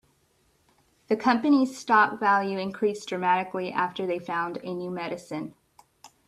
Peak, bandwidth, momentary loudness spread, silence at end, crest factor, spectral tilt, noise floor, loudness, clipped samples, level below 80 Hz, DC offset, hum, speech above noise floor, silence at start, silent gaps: -8 dBFS; 12.5 kHz; 12 LU; 0.2 s; 20 dB; -5.5 dB/octave; -67 dBFS; -26 LUFS; under 0.1%; -72 dBFS; under 0.1%; none; 41 dB; 1.1 s; none